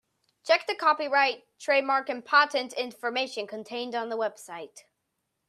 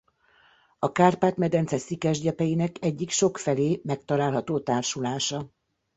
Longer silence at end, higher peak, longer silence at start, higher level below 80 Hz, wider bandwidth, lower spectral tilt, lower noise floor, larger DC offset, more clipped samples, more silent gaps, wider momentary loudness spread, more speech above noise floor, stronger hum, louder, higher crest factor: first, 0.7 s vs 0.5 s; about the same, -8 dBFS vs -6 dBFS; second, 0.45 s vs 0.8 s; second, -86 dBFS vs -62 dBFS; first, 14 kHz vs 8.2 kHz; second, -1.5 dB/octave vs -5 dB/octave; first, -80 dBFS vs -61 dBFS; neither; neither; neither; first, 16 LU vs 8 LU; first, 53 dB vs 36 dB; neither; about the same, -27 LUFS vs -26 LUFS; about the same, 22 dB vs 20 dB